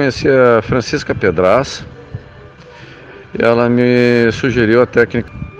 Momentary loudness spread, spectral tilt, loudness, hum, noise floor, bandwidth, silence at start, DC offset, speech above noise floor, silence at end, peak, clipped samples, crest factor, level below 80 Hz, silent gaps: 18 LU; -6.5 dB/octave; -13 LUFS; none; -37 dBFS; 8.6 kHz; 0 s; under 0.1%; 25 dB; 0 s; 0 dBFS; under 0.1%; 14 dB; -40 dBFS; none